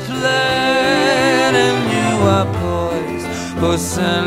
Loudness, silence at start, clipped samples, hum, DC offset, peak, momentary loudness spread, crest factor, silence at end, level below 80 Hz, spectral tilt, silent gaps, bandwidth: -15 LUFS; 0 s; under 0.1%; none; under 0.1%; 0 dBFS; 8 LU; 14 dB; 0 s; -40 dBFS; -4.5 dB/octave; none; 16.5 kHz